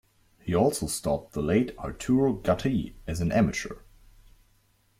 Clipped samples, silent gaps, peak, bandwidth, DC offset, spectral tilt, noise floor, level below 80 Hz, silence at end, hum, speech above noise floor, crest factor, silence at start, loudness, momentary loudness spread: under 0.1%; none; -10 dBFS; 16 kHz; under 0.1%; -6 dB/octave; -65 dBFS; -48 dBFS; 1.2 s; none; 39 dB; 18 dB; 0.45 s; -27 LUFS; 10 LU